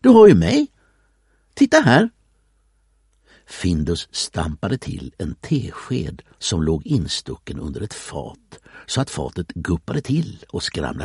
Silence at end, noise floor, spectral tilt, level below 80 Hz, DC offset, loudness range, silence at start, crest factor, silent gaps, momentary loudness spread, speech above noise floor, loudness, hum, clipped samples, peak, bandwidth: 0 s; -61 dBFS; -5.5 dB/octave; -40 dBFS; under 0.1%; 6 LU; 0.05 s; 18 dB; none; 17 LU; 42 dB; -20 LUFS; none; under 0.1%; 0 dBFS; 11.5 kHz